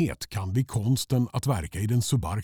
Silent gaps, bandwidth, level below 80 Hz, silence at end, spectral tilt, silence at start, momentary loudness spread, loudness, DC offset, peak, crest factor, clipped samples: none; 18 kHz; -46 dBFS; 0 s; -6 dB/octave; 0 s; 4 LU; -27 LUFS; 0.1%; -12 dBFS; 14 dB; under 0.1%